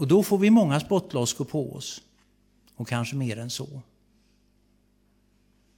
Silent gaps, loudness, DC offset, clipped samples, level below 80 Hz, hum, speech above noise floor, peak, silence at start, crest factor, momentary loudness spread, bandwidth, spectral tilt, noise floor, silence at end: none; -25 LUFS; under 0.1%; under 0.1%; -64 dBFS; 50 Hz at -60 dBFS; 41 dB; -8 dBFS; 0 s; 18 dB; 20 LU; 17.5 kHz; -5.5 dB/octave; -65 dBFS; 1.95 s